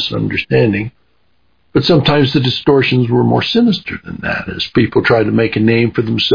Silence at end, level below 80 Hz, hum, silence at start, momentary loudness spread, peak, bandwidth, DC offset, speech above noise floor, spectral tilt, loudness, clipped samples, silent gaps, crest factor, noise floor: 0 s; -42 dBFS; none; 0 s; 8 LU; 0 dBFS; 5.2 kHz; under 0.1%; 48 dB; -7.5 dB/octave; -13 LUFS; under 0.1%; none; 14 dB; -61 dBFS